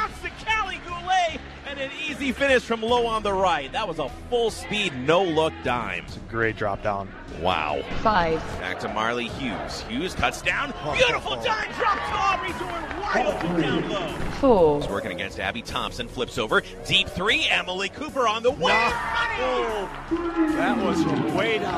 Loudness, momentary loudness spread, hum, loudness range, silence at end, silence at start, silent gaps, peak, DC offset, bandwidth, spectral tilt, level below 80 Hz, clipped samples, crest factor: -24 LUFS; 9 LU; none; 3 LU; 0 s; 0 s; none; -6 dBFS; under 0.1%; 14 kHz; -4.5 dB/octave; -42 dBFS; under 0.1%; 20 dB